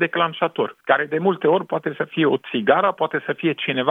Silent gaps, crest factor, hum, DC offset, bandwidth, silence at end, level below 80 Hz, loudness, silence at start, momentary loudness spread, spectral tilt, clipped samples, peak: none; 18 dB; none; under 0.1%; 3.9 kHz; 0 s; -74 dBFS; -21 LUFS; 0 s; 6 LU; -8 dB/octave; under 0.1%; -2 dBFS